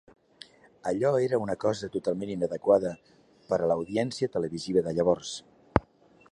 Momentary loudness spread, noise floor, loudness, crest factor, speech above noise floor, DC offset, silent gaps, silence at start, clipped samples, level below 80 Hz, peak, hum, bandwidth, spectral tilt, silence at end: 8 LU; -59 dBFS; -28 LUFS; 28 dB; 32 dB; under 0.1%; none; 0.85 s; under 0.1%; -52 dBFS; 0 dBFS; none; 11 kHz; -6 dB/octave; 0.5 s